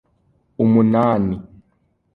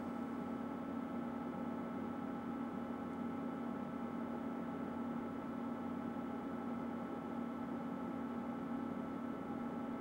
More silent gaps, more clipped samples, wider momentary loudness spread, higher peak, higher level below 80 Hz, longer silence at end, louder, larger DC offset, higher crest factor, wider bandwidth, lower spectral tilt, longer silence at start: neither; neither; first, 10 LU vs 1 LU; first, -2 dBFS vs -32 dBFS; first, -48 dBFS vs -76 dBFS; first, 0.7 s vs 0 s; first, -17 LUFS vs -44 LUFS; neither; about the same, 16 dB vs 12 dB; second, 4.2 kHz vs 16 kHz; first, -11 dB/octave vs -8 dB/octave; first, 0.6 s vs 0 s